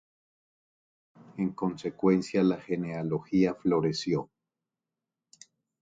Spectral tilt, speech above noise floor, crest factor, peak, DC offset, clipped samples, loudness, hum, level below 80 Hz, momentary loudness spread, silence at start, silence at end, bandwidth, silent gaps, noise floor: -7 dB/octave; 61 dB; 20 dB; -12 dBFS; under 0.1%; under 0.1%; -29 LUFS; none; -64 dBFS; 8 LU; 1.35 s; 1.55 s; 7.8 kHz; none; -89 dBFS